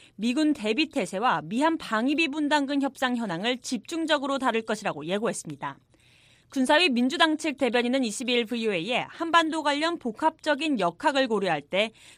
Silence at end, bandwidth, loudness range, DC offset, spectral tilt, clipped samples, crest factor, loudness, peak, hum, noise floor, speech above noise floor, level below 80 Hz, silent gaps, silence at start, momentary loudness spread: 0.3 s; 15 kHz; 4 LU; under 0.1%; -3.5 dB/octave; under 0.1%; 20 dB; -26 LUFS; -6 dBFS; none; -59 dBFS; 33 dB; -70 dBFS; none; 0.2 s; 7 LU